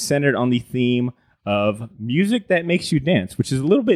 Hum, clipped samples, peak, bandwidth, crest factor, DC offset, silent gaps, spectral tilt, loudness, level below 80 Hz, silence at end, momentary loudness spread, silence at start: none; under 0.1%; -2 dBFS; 15 kHz; 16 dB; under 0.1%; none; -6 dB/octave; -20 LUFS; -54 dBFS; 0 s; 6 LU; 0 s